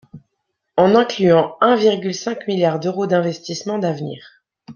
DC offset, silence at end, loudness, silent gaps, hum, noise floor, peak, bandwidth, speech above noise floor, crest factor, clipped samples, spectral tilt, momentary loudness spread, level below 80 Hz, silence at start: under 0.1%; 0.05 s; -18 LUFS; none; none; -75 dBFS; -2 dBFS; 7.2 kHz; 58 dB; 16 dB; under 0.1%; -6 dB/octave; 11 LU; -62 dBFS; 0.15 s